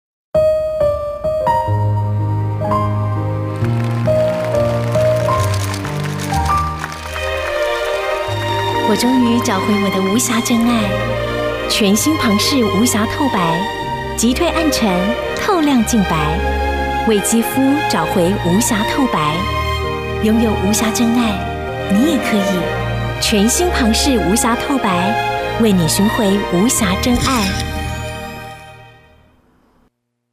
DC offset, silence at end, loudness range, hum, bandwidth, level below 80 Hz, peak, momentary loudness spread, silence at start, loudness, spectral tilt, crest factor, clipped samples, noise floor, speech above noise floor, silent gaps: under 0.1%; 1.4 s; 3 LU; none; 16 kHz; -32 dBFS; -4 dBFS; 7 LU; 0.35 s; -16 LUFS; -4.5 dB/octave; 12 dB; under 0.1%; -62 dBFS; 47 dB; none